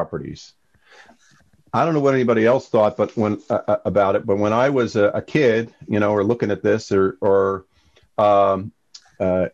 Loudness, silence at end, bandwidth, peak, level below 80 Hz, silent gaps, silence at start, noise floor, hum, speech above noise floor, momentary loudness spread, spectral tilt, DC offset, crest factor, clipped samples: -19 LUFS; 0.05 s; 7.8 kHz; -6 dBFS; -50 dBFS; none; 0 s; -58 dBFS; none; 40 dB; 9 LU; -7 dB/octave; under 0.1%; 14 dB; under 0.1%